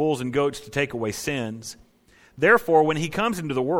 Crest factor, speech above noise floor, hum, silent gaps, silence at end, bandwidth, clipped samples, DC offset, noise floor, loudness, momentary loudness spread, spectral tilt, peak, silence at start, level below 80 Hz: 18 dB; 34 dB; none; none; 0 s; 18.5 kHz; under 0.1%; under 0.1%; -57 dBFS; -23 LUFS; 12 LU; -5 dB/octave; -4 dBFS; 0 s; -54 dBFS